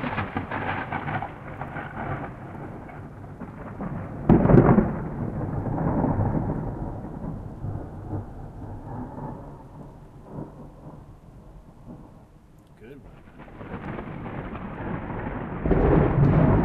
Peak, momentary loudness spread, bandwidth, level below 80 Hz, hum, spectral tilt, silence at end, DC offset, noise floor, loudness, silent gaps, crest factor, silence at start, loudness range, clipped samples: -2 dBFS; 25 LU; 4.5 kHz; -38 dBFS; none; -10.5 dB/octave; 0 s; under 0.1%; -51 dBFS; -26 LUFS; none; 24 dB; 0 s; 21 LU; under 0.1%